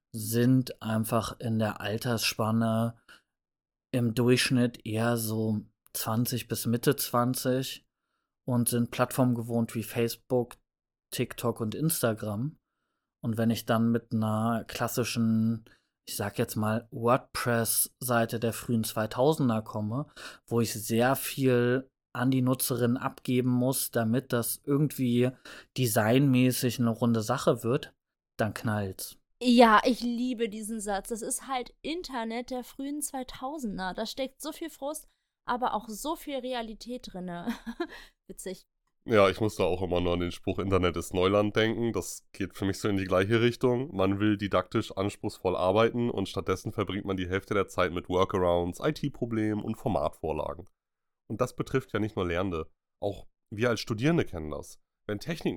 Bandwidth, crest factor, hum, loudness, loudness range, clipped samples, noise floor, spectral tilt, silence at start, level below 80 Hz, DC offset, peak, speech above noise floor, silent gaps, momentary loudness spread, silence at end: 18 kHz; 22 dB; none; -29 LUFS; 7 LU; under 0.1%; -83 dBFS; -5.5 dB/octave; 0.15 s; -56 dBFS; under 0.1%; -6 dBFS; 54 dB; none; 13 LU; 0 s